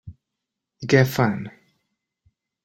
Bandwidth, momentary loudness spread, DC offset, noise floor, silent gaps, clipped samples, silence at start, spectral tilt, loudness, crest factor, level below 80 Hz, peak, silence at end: 16.5 kHz; 18 LU; under 0.1%; -83 dBFS; none; under 0.1%; 0.05 s; -6.5 dB/octave; -20 LUFS; 22 dB; -58 dBFS; -2 dBFS; 1.15 s